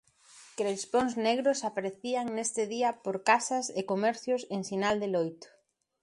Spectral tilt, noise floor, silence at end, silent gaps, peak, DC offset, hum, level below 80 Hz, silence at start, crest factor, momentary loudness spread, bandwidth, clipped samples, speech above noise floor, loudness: -3.5 dB/octave; -57 dBFS; 0.55 s; none; -10 dBFS; under 0.1%; none; -72 dBFS; 0.35 s; 22 dB; 8 LU; 11.5 kHz; under 0.1%; 27 dB; -30 LUFS